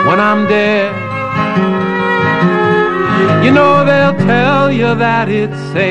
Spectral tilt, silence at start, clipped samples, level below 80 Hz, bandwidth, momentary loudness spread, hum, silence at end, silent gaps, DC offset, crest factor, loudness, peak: -7.5 dB/octave; 0 s; under 0.1%; -46 dBFS; 9.4 kHz; 7 LU; none; 0 s; none; under 0.1%; 10 dB; -11 LUFS; 0 dBFS